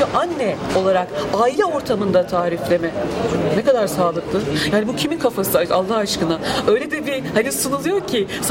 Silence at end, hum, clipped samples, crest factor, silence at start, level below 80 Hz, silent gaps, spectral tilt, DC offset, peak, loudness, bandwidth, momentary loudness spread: 0 s; none; under 0.1%; 16 dB; 0 s; -46 dBFS; none; -4.5 dB/octave; under 0.1%; -4 dBFS; -19 LUFS; 17 kHz; 4 LU